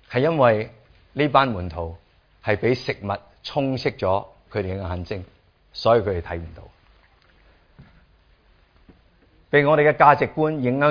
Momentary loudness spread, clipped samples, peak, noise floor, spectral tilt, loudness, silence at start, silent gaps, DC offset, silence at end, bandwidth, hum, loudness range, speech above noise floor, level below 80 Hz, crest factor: 17 LU; under 0.1%; 0 dBFS; -57 dBFS; -7.5 dB/octave; -21 LUFS; 0.1 s; none; under 0.1%; 0 s; 5.2 kHz; none; 7 LU; 37 dB; -48 dBFS; 22 dB